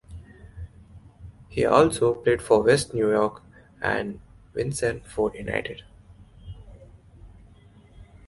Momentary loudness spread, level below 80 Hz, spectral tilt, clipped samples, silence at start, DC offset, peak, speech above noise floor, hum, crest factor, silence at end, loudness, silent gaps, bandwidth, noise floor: 25 LU; -48 dBFS; -5 dB/octave; under 0.1%; 0.1 s; under 0.1%; -2 dBFS; 29 dB; none; 24 dB; 0.25 s; -24 LUFS; none; 11.5 kHz; -52 dBFS